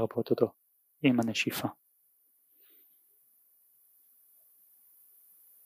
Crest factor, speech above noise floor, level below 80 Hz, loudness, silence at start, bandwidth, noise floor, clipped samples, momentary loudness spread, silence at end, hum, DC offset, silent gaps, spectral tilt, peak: 24 dB; 40 dB; -84 dBFS; -30 LUFS; 0 s; 15.5 kHz; -69 dBFS; under 0.1%; 8 LU; 3.95 s; none; under 0.1%; none; -5 dB/octave; -10 dBFS